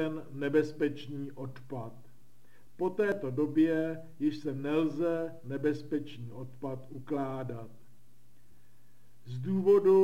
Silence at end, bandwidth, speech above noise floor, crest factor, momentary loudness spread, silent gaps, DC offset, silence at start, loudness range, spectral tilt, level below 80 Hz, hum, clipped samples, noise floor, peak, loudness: 0 s; 15 kHz; 35 dB; 18 dB; 16 LU; none; 0.5%; 0 s; 9 LU; -8 dB/octave; -74 dBFS; none; under 0.1%; -66 dBFS; -16 dBFS; -32 LUFS